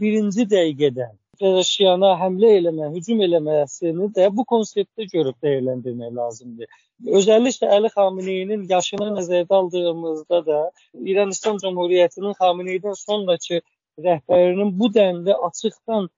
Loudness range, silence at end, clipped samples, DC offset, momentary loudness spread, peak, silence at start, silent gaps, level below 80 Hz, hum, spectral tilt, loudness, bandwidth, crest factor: 3 LU; 0.1 s; under 0.1%; under 0.1%; 11 LU; -4 dBFS; 0 s; none; -72 dBFS; none; -4.5 dB/octave; -20 LUFS; 7.6 kHz; 16 dB